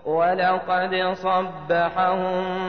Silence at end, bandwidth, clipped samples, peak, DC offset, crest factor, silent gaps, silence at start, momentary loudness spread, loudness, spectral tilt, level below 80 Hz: 0 s; 6.4 kHz; under 0.1%; -10 dBFS; 0.3%; 12 dB; none; 0.05 s; 4 LU; -22 LUFS; -7 dB/octave; -58 dBFS